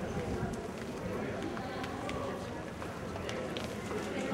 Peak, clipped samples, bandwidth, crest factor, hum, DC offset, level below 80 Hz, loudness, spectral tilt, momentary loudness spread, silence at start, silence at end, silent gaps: -20 dBFS; under 0.1%; 16 kHz; 18 dB; none; under 0.1%; -52 dBFS; -39 LUFS; -5.5 dB/octave; 4 LU; 0 s; 0 s; none